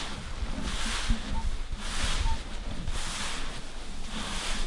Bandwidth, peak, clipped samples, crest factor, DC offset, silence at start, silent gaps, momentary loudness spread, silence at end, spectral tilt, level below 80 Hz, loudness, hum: 11.5 kHz; -14 dBFS; under 0.1%; 16 dB; under 0.1%; 0 s; none; 8 LU; 0 s; -3 dB/octave; -32 dBFS; -34 LUFS; none